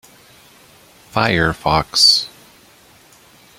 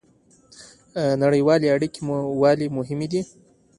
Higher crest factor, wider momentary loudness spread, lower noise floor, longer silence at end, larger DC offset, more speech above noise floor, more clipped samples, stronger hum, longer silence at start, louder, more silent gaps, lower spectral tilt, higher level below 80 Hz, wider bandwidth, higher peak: about the same, 20 dB vs 16 dB; first, 12 LU vs 9 LU; second, -48 dBFS vs -57 dBFS; first, 1.3 s vs 0.55 s; neither; second, 33 dB vs 37 dB; neither; neither; first, 1.15 s vs 0.6 s; first, -14 LUFS vs -21 LUFS; neither; second, -2.5 dB/octave vs -7 dB/octave; first, -42 dBFS vs -60 dBFS; first, 16.5 kHz vs 11.5 kHz; first, 0 dBFS vs -6 dBFS